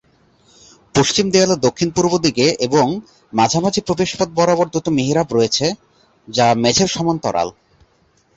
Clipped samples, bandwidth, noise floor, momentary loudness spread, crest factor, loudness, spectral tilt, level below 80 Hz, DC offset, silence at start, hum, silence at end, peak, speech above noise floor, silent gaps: under 0.1%; 8.2 kHz; -58 dBFS; 7 LU; 16 dB; -16 LUFS; -4 dB/octave; -48 dBFS; under 0.1%; 0.95 s; none; 0.85 s; -2 dBFS; 41 dB; none